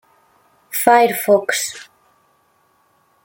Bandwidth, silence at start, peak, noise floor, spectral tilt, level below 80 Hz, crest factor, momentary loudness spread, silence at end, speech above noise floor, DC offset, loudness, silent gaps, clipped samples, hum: 17 kHz; 0.7 s; 0 dBFS; -60 dBFS; -2.5 dB/octave; -68 dBFS; 20 dB; 13 LU; 1.4 s; 45 dB; under 0.1%; -16 LUFS; none; under 0.1%; none